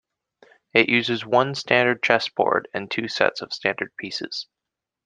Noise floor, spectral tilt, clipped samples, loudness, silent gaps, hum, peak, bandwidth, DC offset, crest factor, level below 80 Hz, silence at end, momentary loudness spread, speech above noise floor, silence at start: -86 dBFS; -4.5 dB/octave; under 0.1%; -22 LUFS; none; none; -2 dBFS; 9.6 kHz; under 0.1%; 22 dB; -68 dBFS; 0.6 s; 11 LU; 63 dB; 0.75 s